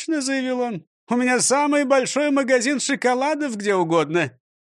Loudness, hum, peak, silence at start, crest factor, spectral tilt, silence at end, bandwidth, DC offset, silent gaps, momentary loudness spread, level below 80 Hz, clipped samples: -20 LUFS; none; -6 dBFS; 0 s; 16 dB; -3.5 dB/octave; 0.4 s; 12.5 kHz; under 0.1%; 0.87-1.07 s; 8 LU; -74 dBFS; under 0.1%